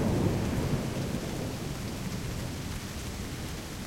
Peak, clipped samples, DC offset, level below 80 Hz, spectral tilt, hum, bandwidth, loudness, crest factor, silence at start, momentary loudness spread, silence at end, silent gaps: -14 dBFS; under 0.1%; under 0.1%; -42 dBFS; -5.5 dB/octave; none; 16.5 kHz; -34 LUFS; 18 dB; 0 s; 8 LU; 0 s; none